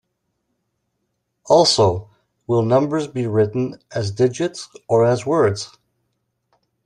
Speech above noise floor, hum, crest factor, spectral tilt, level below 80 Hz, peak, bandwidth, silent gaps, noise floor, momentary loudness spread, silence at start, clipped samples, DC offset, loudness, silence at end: 56 dB; none; 20 dB; -5.5 dB/octave; -58 dBFS; -2 dBFS; 11.5 kHz; none; -73 dBFS; 11 LU; 1.45 s; under 0.1%; under 0.1%; -18 LUFS; 1.2 s